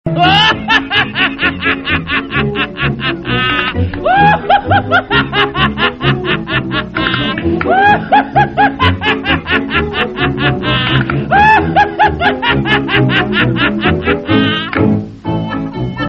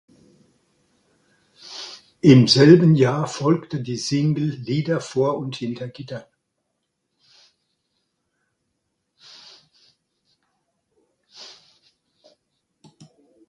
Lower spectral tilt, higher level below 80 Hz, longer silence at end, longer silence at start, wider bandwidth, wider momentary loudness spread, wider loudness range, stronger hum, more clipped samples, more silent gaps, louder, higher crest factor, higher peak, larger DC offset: about the same, -6.5 dB/octave vs -6.5 dB/octave; first, -32 dBFS vs -62 dBFS; second, 0 s vs 2.05 s; second, 0.05 s vs 1.7 s; second, 7.8 kHz vs 11 kHz; second, 6 LU vs 25 LU; second, 2 LU vs 15 LU; neither; neither; neither; first, -12 LUFS vs -18 LUFS; second, 12 dB vs 22 dB; about the same, 0 dBFS vs 0 dBFS; neither